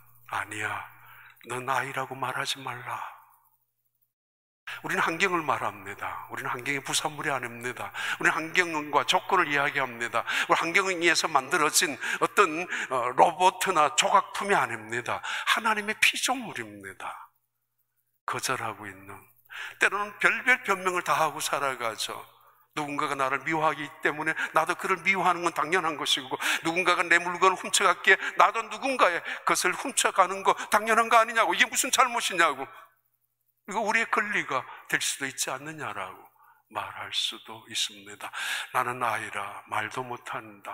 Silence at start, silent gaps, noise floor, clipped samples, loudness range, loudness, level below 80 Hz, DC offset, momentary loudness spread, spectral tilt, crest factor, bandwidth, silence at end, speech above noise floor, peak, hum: 0.3 s; 4.13-4.67 s, 18.21-18.27 s; -78 dBFS; under 0.1%; 9 LU; -26 LUFS; -74 dBFS; under 0.1%; 14 LU; -2 dB/octave; 26 dB; 16 kHz; 0 s; 51 dB; -2 dBFS; 60 Hz at -65 dBFS